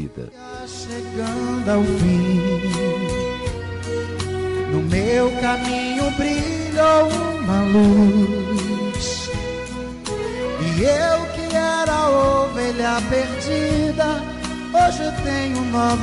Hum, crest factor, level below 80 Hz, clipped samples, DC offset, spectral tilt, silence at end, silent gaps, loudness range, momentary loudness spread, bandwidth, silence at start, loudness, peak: none; 12 dB; -38 dBFS; under 0.1%; under 0.1%; -5.5 dB/octave; 0 s; none; 4 LU; 12 LU; 11.5 kHz; 0 s; -20 LUFS; -8 dBFS